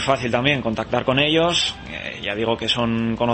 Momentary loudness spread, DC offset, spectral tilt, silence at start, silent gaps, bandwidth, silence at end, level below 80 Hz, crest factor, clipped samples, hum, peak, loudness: 9 LU; under 0.1%; -4.5 dB/octave; 0 s; none; 8.8 kHz; 0 s; -44 dBFS; 18 dB; under 0.1%; none; -4 dBFS; -20 LUFS